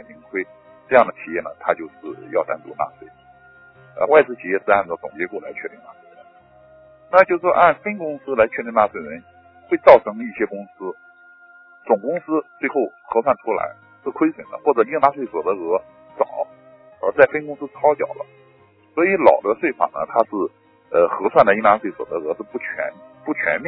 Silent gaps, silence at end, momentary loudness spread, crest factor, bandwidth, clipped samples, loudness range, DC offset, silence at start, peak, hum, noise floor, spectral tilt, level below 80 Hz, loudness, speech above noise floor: none; 0 s; 17 LU; 20 dB; 5.4 kHz; under 0.1%; 5 LU; under 0.1%; 0.1 s; 0 dBFS; none; -53 dBFS; -8.5 dB/octave; -60 dBFS; -19 LUFS; 34 dB